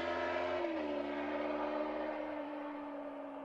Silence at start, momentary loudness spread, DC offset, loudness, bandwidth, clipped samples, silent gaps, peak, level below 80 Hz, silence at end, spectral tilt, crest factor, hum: 0 s; 8 LU; under 0.1%; -39 LUFS; 7.8 kHz; under 0.1%; none; -26 dBFS; -70 dBFS; 0 s; -5.5 dB/octave; 14 dB; none